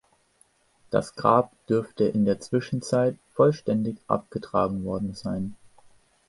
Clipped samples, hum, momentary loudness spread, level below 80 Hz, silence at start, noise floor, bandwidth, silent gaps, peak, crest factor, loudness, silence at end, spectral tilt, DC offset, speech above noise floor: under 0.1%; none; 9 LU; -56 dBFS; 0.9 s; -64 dBFS; 11.5 kHz; none; -4 dBFS; 22 dB; -26 LUFS; 0.75 s; -7 dB/octave; under 0.1%; 39 dB